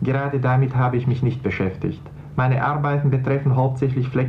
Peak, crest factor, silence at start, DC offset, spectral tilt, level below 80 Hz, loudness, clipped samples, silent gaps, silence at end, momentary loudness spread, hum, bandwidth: -6 dBFS; 14 dB; 0 s; under 0.1%; -10 dB/octave; -46 dBFS; -21 LUFS; under 0.1%; none; 0 s; 6 LU; none; 4.9 kHz